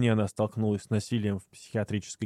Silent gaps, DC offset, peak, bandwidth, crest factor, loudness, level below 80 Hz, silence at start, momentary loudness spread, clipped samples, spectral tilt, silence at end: none; under 0.1%; -14 dBFS; 12 kHz; 14 dB; -30 LUFS; -64 dBFS; 0 s; 7 LU; under 0.1%; -6.5 dB/octave; 0 s